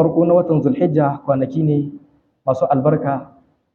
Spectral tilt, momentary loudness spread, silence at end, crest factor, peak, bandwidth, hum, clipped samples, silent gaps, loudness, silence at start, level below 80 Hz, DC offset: -11 dB/octave; 9 LU; 0.5 s; 14 dB; -2 dBFS; 6.6 kHz; none; under 0.1%; none; -17 LUFS; 0 s; -56 dBFS; under 0.1%